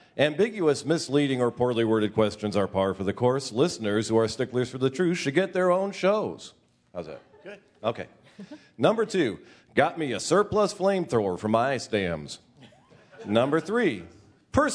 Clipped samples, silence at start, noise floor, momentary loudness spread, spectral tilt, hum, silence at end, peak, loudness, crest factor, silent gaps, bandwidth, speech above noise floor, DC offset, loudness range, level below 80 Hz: under 0.1%; 0.15 s; -55 dBFS; 18 LU; -5.5 dB/octave; none; 0 s; -6 dBFS; -26 LUFS; 20 dB; none; 11 kHz; 29 dB; under 0.1%; 5 LU; -58 dBFS